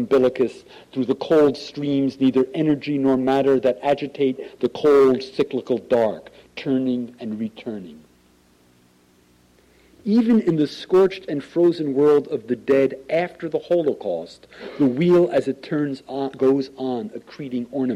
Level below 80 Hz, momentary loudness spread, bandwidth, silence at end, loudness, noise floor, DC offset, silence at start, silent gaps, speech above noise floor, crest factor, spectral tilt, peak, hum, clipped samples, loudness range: -60 dBFS; 13 LU; 11 kHz; 0 s; -21 LUFS; -57 dBFS; under 0.1%; 0 s; none; 36 dB; 12 dB; -7.5 dB/octave; -8 dBFS; none; under 0.1%; 7 LU